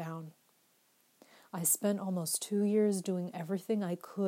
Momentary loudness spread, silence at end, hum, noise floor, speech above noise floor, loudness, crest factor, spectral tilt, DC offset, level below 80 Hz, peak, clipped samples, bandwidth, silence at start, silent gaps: 14 LU; 0 s; none; -71 dBFS; 38 dB; -33 LUFS; 18 dB; -5 dB/octave; under 0.1%; under -90 dBFS; -16 dBFS; under 0.1%; 16 kHz; 0 s; none